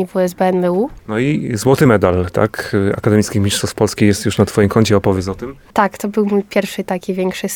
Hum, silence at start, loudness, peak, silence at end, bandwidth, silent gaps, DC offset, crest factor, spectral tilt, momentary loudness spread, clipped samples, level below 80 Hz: none; 0 s; -16 LUFS; 0 dBFS; 0 s; 18.5 kHz; none; under 0.1%; 14 dB; -6 dB/octave; 8 LU; under 0.1%; -42 dBFS